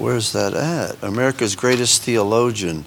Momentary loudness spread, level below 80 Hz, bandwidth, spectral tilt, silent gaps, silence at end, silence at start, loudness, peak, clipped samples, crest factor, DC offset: 7 LU; -52 dBFS; 19 kHz; -3.5 dB/octave; none; 0 s; 0 s; -18 LUFS; -2 dBFS; under 0.1%; 18 dB; under 0.1%